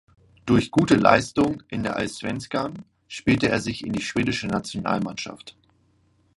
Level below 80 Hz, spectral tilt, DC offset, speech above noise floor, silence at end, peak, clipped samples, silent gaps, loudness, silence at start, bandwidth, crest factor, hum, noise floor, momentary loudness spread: -50 dBFS; -5.5 dB/octave; under 0.1%; 40 dB; 0.85 s; 0 dBFS; under 0.1%; none; -23 LUFS; 0.45 s; 11.5 kHz; 24 dB; none; -63 dBFS; 15 LU